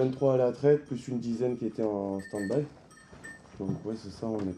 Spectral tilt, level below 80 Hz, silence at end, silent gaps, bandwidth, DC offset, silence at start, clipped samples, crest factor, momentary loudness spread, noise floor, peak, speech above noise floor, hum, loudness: -8 dB/octave; -64 dBFS; 0 s; none; 10 kHz; under 0.1%; 0 s; under 0.1%; 18 dB; 16 LU; -49 dBFS; -12 dBFS; 19 dB; none; -30 LUFS